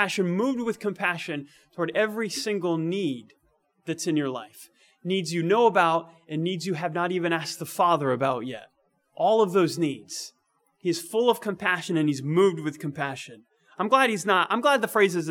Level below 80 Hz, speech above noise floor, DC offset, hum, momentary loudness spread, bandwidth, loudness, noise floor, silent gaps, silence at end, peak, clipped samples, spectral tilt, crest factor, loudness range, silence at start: -78 dBFS; 43 dB; under 0.1%; none; 14 LU; 18 kHz; -25 LUFS; -69 dBFS; none; 0 s; -4 dBFS; under 0.1%; -5 dB/octave; 20 dB; 4 LU; 0 s